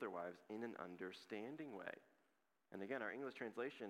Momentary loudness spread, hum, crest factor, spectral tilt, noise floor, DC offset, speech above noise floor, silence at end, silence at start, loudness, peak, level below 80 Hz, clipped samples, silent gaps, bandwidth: 8 LU; none; 20 dB; -6 dB/octave; -85 dBFS; under 0.1%; 34 dB; 0 s; 0 s; -51 LUFS; -32 dBFS; under -90 dBFS; under 0.1%; none; 16 kHz